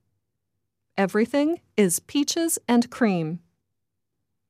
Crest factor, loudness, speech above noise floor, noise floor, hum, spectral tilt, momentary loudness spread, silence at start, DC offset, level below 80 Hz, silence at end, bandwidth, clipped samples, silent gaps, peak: 16 dB; -23 LUFS; 59 dB; -82 dBFS; none; -4 dB/octave; 8 LU; 0.95 s; under 0.1%; -70 dBFS; 1.1 s; 15.5 kHz; under 0.1%; none; -8 dBFS